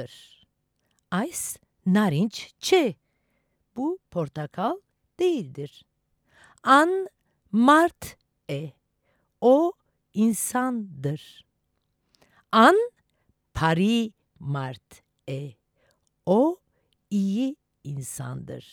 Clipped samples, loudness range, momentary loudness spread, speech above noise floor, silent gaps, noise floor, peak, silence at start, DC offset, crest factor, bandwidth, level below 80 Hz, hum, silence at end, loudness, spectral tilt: under 0.1%; 6 LU; 20 LU; 51 dB; none; -75 dBFS; -4 dBFS; 0 s; under 0.1%; 22 dB; 18 kHz; -58 dBFS; none; 0.15 s; -24 LUFS; -5 dB/octave